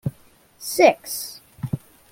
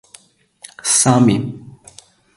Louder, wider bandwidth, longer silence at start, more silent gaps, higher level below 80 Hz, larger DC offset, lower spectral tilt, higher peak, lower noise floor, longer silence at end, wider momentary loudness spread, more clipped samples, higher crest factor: second, -22 LUFS vs -14 LUFS; first, 17 kHz vs 11.5 kHz; second, 0.05 s vs 0.85 s; neither; second, -58 dBFS vs -52 dBFS; neither; about the same, -4.5 dB/octave vs -4 dB/octave; about the same, -2 dBFS vs 0 dBFS; first, -54 dBFS vs -48 dBFS; second, 0.35 s vs 0.65 s; about the same, 18 LU vs 17 LU; neither; about the same, 22 dB vs 18 dB